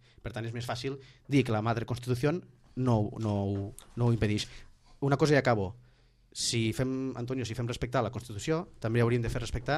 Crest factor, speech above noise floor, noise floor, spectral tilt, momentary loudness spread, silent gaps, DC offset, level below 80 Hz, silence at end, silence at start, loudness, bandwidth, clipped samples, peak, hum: 18 dB; 31 dB; -62 dBFS; -6 dB/octave; 11 LU; none; under 0.1%; -50 dBFS; 0 s; 0.25 s; -31 LUFS; 13 kHz; under 0.1%; -12 dBFS; none